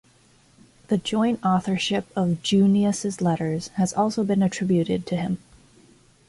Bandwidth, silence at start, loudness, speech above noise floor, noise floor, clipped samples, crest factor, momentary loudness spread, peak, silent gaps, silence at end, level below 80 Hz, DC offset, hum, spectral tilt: 11.5 kHz; 0.9 s; -23 LUFS; 35 dB; -57 dBFS; under 0.1%; 14 dB; 7 LU; -10 dBFS; none; 0.9 s; -58 dBFS; under 0.1%; none; -6 dB/octave